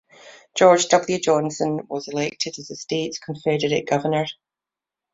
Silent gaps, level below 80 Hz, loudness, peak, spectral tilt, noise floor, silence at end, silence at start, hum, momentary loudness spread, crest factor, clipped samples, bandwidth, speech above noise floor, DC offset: none; -64 dBFS; -21 LUFS; -2 dBFS; -4 dB/octave; -88 dBFS; 0.8 s; 0.25 s; none; 12 LU; 20 dB; under 0.1%; 8 kHz; 68 dB; under 0.1%